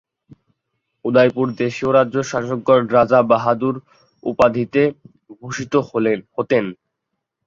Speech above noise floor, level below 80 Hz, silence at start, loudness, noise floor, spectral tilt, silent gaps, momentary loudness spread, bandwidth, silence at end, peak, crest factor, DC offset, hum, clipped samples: 61 dB; -56 dBFS; 1.05 s; -18 LUFS; -78 dBFS; -6.5 dB/octave; none; 14 LU; 7.6 kHz; 0.7 s; -2 dBFS; 18 dB; under 0.1%; none; under 0.1%